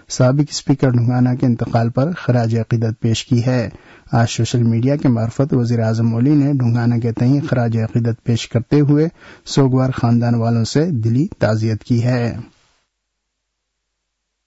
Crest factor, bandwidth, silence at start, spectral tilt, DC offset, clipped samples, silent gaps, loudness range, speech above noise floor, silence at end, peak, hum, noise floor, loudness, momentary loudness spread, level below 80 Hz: 12 dB; 8 kHz; 0.1 s; -7 dB/octave; under 0.1%; under 0.1%; none; 3 LU; 59 dB; 2 s; -4 dBFS; none; -75 dBFS; -17 LUFS; 5 LU; -48 dBFS